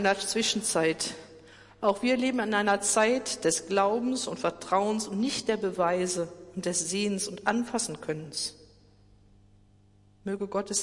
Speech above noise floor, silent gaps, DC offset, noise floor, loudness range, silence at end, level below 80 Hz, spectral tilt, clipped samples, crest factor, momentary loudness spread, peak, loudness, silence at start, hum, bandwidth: 32 dB; none; under 0.1%; -60 dBFS; 7 LU; 0 s; -64 dBFS; -3 dB/octave; under 0.1%; 18 dB; 9 LU; -10 dBFS; -28 LUFS; 0 s; none; 11.5 kHz